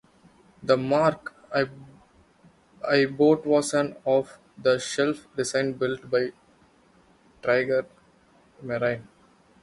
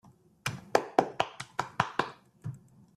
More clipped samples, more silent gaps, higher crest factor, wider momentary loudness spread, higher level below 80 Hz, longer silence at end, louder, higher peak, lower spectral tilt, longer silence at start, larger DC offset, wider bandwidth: neither; neither; second, 20 dB vs 28 dB; second, 13 LU vs 16 LU; about the same, -64 dBFS vs -68 dBFS; first, 0.6 s vs 0.4 s; first, -25 LUFS vs -32 LUFS; about the same, -6 dBFS vs -6 dBFS; about the same, -5 dB/octave vs -4.5 dB/octave; first, 0.6 s vs 0.45 s; neither; second, 11.5 kHz vs 14.5 kHz